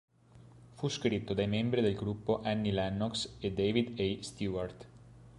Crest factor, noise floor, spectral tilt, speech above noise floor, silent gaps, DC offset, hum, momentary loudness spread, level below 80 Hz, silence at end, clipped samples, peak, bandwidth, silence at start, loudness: 18 dB; -58 dBFS; -6 dB/octave; 25 dB; none; under 0.1%; none; 8 LU; -56 dBFS; 0 s; under 0.1%; -16 dBFS; 11.5 kHz; 0.35 s; -34 LUFS